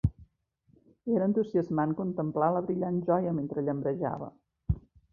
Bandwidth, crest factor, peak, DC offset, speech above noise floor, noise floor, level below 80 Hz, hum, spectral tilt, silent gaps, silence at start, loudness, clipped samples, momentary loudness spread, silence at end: 5 kHz; 18 dB; -12 dBFS; under 0.1%; 39 dB; -68 dBFS; -46 dBFS; none; -11.5 dB/octave; none; 0.05 s; -30 LUFS; under 0.1%; 8 LU; 0.35 s